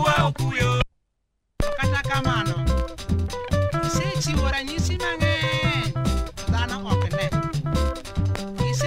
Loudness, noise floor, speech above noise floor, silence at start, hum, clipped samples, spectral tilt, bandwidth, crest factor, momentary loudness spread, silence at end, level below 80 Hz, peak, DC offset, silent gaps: -24 LUFS; -74 dBFS; 51 dB; 0 s; none; under 0.1%; -5 dB/octave; 16 kHz; 18 dB; 5 LU; 0 s; -32 dBFS; -6 dBFS; under 0.1%; none